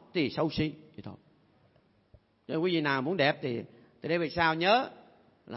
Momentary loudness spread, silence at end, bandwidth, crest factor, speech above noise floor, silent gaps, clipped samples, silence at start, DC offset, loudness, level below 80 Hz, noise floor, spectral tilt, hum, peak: 21 LU; 0 s; 6 kHz; 20 dB; 37 dB; none; under 0.1%; 0.15 s; under 0.1%; -29 LUFS; -62 dBFS; -66 dBFS; -8.5 dB/octave; none; -12 dBFS